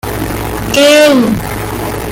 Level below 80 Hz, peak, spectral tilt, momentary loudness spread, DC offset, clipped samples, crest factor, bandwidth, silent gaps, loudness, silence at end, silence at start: -28 dBFS; 0 dBFS; -4 dB/octave; 13 LU; under 0.1%; under 0.1%; 10 dB; 17.5 kHz; none; -10 LUFS; 0 s; 0.05 s